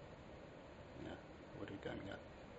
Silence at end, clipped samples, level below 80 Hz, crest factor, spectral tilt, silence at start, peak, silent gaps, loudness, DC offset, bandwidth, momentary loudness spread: 0 s; under 0.1%; -66 dBFS; 18 dB; -5 dB/octave; 0 s; -34 dBFS; none; -53 LUFS; under 0.1%; 7.6 kHz; 8 LU